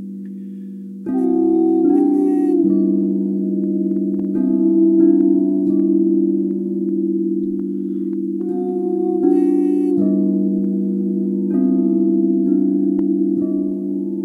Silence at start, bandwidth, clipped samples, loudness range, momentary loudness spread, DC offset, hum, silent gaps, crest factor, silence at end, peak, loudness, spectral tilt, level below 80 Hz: 0 s; 2 kHz; under 0.1%; 3 LU; 8 LU; under 0.1%; none; none; 14 dB; 0 s; -4 dBFS; -17 LUFS; -12 dB/octave; -66 dBFS